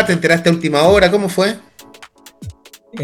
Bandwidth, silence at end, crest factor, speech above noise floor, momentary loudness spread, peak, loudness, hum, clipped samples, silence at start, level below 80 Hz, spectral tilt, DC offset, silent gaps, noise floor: 15.5 kHz; 0 s; 16 dB; 29 dB; 25 LU; 0 dBFS; -13 LUFS; none; under 0.1%; 0 s; -40 dBFS; -5 dB/octave; under 0.1%; none; -42 dBFS